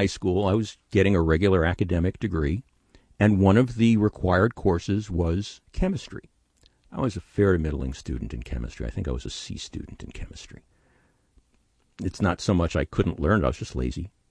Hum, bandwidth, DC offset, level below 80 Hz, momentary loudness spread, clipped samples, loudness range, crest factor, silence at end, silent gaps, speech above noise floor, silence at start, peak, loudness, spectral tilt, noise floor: none; 10 kHz; under 0.1%; -38 dBFS; 16 LU; under 0.1%; 12 LU; 18 dB; 0.2 s; none; 42 dB; 0 s; -6 dBFS; -25 LUFS; -7 dB/octave; -66 dBFS